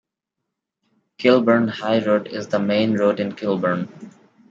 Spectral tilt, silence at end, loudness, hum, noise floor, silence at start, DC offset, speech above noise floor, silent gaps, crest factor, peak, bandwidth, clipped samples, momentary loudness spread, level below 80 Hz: -7 dB/octave; 0.4 s; -20 LUFS; none; -81 dBFS; 1.2 s; under 0.1%; 62 dB; none; 18 dB; -4 dBFS; 7.6 kHz; under 0.1%; 8 LU; -68 dBFS